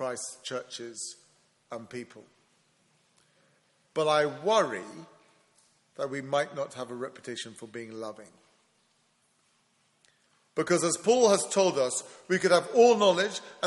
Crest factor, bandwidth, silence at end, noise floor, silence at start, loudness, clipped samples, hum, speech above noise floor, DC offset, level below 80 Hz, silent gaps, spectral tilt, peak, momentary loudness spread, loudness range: 22 dB; 11.5 kHz; 0 s; -70 dBFS; 0 s; -27 LUFS; under 0.1%; none; 42 dB; under 0.1%; -78 dBFS; none; -3.5 dB/octave; -8 dBFS; 20 LU; 18 LU